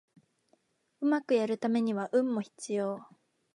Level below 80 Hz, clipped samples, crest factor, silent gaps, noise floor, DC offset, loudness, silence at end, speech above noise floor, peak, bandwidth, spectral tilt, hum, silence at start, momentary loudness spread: -86 dBFS; under 0.1%; 16 dB; none; -72 dBFS; under 0.1%; -31 LUFS; 0.5 s; 42 dB; -16 dBFS; 11.5 kHz; -6 dB/octave; none; 1 s; 8 LU